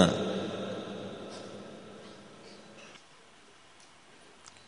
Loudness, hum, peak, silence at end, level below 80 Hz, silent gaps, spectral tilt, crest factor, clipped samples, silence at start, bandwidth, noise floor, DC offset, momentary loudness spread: -37 LUFS; none; -6 dBFS; 0.05 s; -66 dBFS; none; -5.5 dB/octave; 30 dB; under 0.1%; 0 s; 10.5 kHz; -58 dBFS; under 0.1%; 22 LU